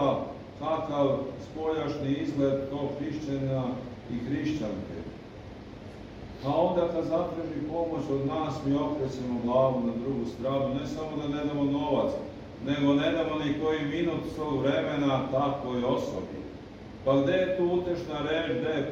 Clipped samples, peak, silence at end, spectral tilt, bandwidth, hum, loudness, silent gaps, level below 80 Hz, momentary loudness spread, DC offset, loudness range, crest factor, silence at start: under 0.1%; -12 dBFS; 0 s; -7.5 dB/octave; 7.6 kHz; none; -29 LUFS; none; -52 dBFS; 13 LU; under 0.1%; 4 LU; 16 dB; 0 s